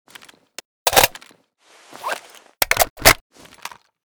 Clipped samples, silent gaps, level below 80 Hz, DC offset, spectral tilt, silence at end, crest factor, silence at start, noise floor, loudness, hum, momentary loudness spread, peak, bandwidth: under 0.1%; 2.90-2.96 s; -38 dBFS; under 0.1%; -1 dB/octave; 1 s; 22 dB; 0.85 s; -54 dBFS; -17 LUFS; none; 24 LU; 0 dBFS; over 20 kHz